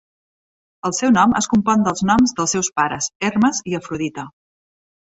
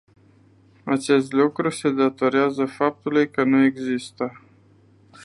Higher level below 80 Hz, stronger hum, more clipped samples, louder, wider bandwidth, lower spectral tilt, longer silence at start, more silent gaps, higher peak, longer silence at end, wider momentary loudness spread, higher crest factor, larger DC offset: first, -50 dBFS vs -68 dBFS; neither; neither; first, -18 LUFS vs -21 LUFS; second, 8.2 kHz vs 11.5 kHz; second, -4 dB/octave vs -5.5 dB/octave; about the same, 0.85 s vs 0.85 s; first, 3.15-3.20 s vs none; about the same, -2 dBFS vs -4 dBFS; about the same, 0.75 s vs 0.85 s; about the same, 11 LU vs 10 LU; about the same, 18 dB vs 18 dB; neither